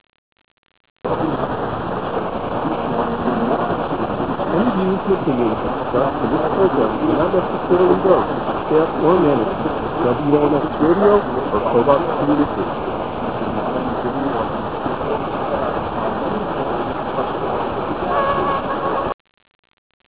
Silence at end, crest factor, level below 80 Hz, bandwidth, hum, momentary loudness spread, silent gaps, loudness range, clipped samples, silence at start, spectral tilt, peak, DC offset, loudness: 0 s; 18 dB; -42 dBFS; 4 kHz; none; 8 LU; 19.14-19.25 s, 19.55-19.63 s, 19.73-20.00 s; 5 LU; under 0.1%; 1.05 s; -11 dB/octave; 0 dBFS; 1%; -19 LUFS